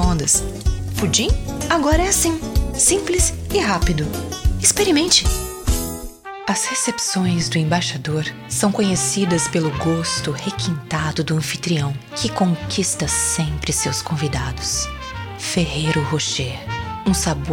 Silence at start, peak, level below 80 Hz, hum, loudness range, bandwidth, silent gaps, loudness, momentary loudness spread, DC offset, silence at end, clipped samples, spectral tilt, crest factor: 0 s; -2 dBFS; -28 dBFS; none; 4 LU; 18 kHz; none; -19 LUFS; 9 LU; under 0.1%; 0 s; under 0.1%; -3.5 dB/octave; 18 dB